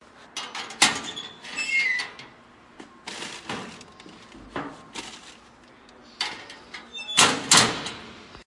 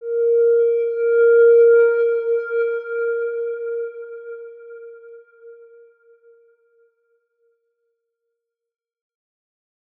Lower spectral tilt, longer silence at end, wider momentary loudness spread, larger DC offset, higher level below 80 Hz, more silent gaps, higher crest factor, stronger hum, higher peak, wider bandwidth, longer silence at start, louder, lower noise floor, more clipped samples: second, -0.5 dB/octave vs -4.5 dB/octave; second, 0.05 s vs 4.45 s; about the same, 24 LU vs 24 LU; neither; first, -62 dBFS vs under -90 dBFS; neither; first, 26 dB vs 14 dB; neither; first, -2 dBFS vs -6 dBFS; first, 11.5 kHz vs 3.5 kHz; first, 0.2 s vs 0 s; second, -23 LUFS vs -17 LUFS; second, -52 dBFS vs -80 dBFS; neither